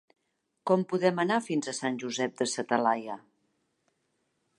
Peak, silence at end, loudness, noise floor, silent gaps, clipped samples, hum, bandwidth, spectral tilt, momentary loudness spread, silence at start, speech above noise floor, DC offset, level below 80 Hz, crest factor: -10 dBFS; 1.4 s; -29 LUFS; -79 dBFS; none; under 0.1%; none; 11.5 kHz; -4.5 dB/octave; 8 LU; 0.65 s; 50 dB; under 0.1%; -82 dBFS; 22 dB